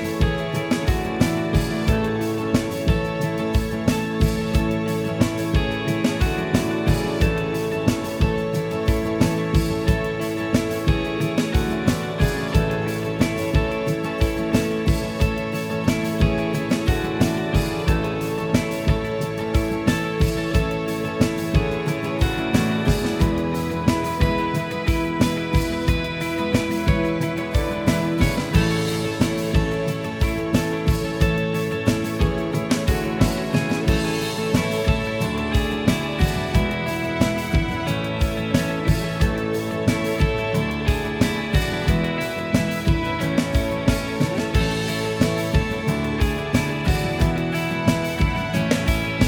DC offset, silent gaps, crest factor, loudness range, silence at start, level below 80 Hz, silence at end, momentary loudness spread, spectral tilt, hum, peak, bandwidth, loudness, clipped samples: under 0.1%; none; 20 dB; 1 LU; 0 s; -28 dBFS; 0 s; 3 LU; -6 dB/octave; none; -2 dBFS; over 20 kHz; -22 LUFS; under 0.1%